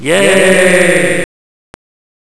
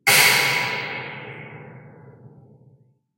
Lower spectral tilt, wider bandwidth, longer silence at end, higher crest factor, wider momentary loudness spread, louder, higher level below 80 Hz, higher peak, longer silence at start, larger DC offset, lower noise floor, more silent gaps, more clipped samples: first, -3.5 dB/octave vs -0.5 dB/octave; second, 11 kHz vs 16 kHz; about the same, 1 s vs 0.9 s; second, 12 dB vs 22 dB; second, 9 LU vs 26 LU; first, -8 LUFS vs -18 LUFS; first, -50 dBFS vs -70 dBFS; about the same, 0 dBFS vs -2 dBFS; about the same, 0 s vs 0.05 s; neither; first, under -90 dBFS vs -57 dBFS; neither; first, 0.4% vs under 0.1%